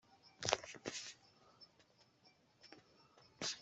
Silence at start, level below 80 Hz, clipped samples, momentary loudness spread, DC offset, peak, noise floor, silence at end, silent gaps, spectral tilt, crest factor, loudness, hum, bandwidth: 0.1 s; -80 dBFS; under 0.1%; 26 LU; under 0.1%; -12 dBFS; -72 dBFS; 0 s; none; -1.5 dB/octave; 36 dB; -43 LUFS; none; 8.2 kHz